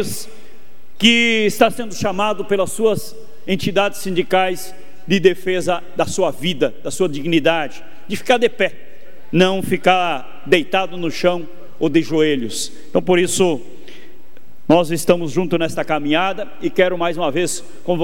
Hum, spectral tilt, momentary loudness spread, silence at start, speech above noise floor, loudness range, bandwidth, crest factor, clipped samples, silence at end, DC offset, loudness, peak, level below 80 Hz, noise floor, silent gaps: none; -4.5 dB/octave; 10 LU; 0 s; 32 dB; 2 LU; 16.5 kHz; 18 dB; under 0.1%; 0 s; 6%; -18 LUFS; 0 dBFS; -56 dBFS; -50 dBFS; none